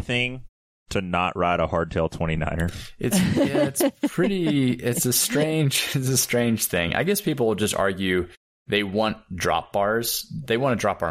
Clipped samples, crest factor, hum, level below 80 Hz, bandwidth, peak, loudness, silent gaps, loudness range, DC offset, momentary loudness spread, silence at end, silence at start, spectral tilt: under 0.1%; 16 dB; none; -44 dBFS; 16 kHz; -6 dBFS; -23 LUFS; 0.49-0.86 s, 8.37-8.66 s; 3 LU; under 0.1%; 6 LU; 0 s; 0 s; -4 dB/octave